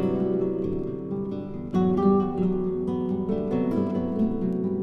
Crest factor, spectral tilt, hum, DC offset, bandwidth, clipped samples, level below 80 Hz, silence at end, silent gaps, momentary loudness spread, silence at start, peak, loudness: 14 dB; -10.5 dB/octave; none; under 0.1%; 5.6 kHz; under 0.1%; -46 dBFS; 0 s; none; 9 LU; 0 s; -10 dBFS; -26 LUFS